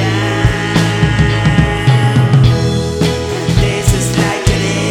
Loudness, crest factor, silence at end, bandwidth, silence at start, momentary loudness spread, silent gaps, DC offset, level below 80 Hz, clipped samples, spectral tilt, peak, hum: -12 LUFS; 12 dB; 0 s; 16 kHz; 0 s; 5 LU; none; under 0.1%; -24 dBFS; under 0.1%; -5.5 dB/octave; 0 dBFS; none